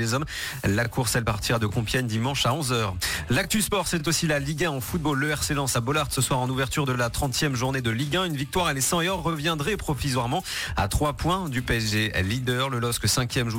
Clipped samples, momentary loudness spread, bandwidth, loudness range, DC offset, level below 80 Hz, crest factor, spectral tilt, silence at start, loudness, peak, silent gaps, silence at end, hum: under 0.1%; 4 LU; 17 kHz; 1 LU; under 0.1%; -40 dBFS; 16 dB; -4 dB/octave; 0 s; -25 LUFS; -10 dBFS; none; 0 s; none